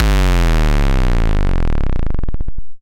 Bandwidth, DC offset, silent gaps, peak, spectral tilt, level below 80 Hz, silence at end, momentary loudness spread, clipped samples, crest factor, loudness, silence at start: 12.5 kHz; under 0.1%; none; -2 dBFS; -6 dB/octave; -14 dBFS; 0.05 s; 11 LU; under 0.1%; 10 dB; -18 LUFS; 0 s